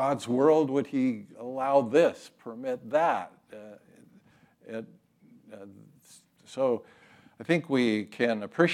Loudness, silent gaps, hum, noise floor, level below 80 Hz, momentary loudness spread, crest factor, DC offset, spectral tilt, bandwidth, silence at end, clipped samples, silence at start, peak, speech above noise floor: -27 LUFS; none; none; -60 dBFS; -84 dBFS; 21 LU; 20 dB; under 0.1%; -6 dB/octave; 13 kHz; 0 s; under 0.1%; 0 s; -8 dBFS; 33 dB